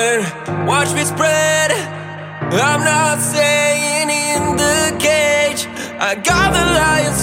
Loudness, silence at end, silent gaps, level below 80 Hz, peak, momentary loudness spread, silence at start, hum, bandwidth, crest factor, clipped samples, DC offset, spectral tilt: -14 LUFS; 0 s; none; -36 dBFS; -2 dBFS; 8 LU; 0 s; none; 17 kHz; 14 dB; under 0.1%; under 0.1%; -3 dB/octave